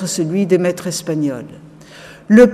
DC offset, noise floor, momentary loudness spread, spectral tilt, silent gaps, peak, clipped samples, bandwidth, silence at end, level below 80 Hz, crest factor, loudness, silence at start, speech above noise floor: under 0.1%; -39 dBFS; 24 LU; -5.5 dB/octave; none; 0 dBFS; under 0.1%; 15 kHz; 0 s; -52 dBFS; 16 dB; -16 LUFS; 0 s; 21 dB